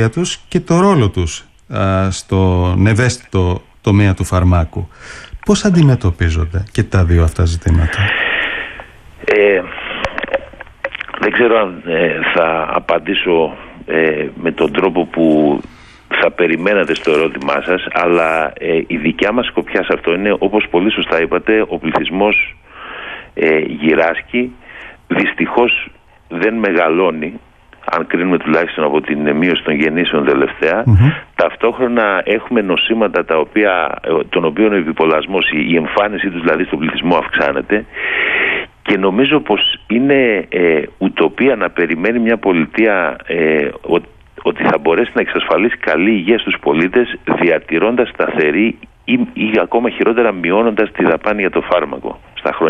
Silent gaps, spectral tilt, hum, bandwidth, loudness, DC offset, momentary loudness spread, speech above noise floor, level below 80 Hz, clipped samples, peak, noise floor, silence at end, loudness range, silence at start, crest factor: none; -6 dB/octave; none; 11.5 kHz; -14 LUFS; under 0.1%; 8 LU; 21 dB; -32 dBFS; under 0.1%; 0 dBFS; -35 dBFS; 0 s; 2 LU; 0 s; 14 dB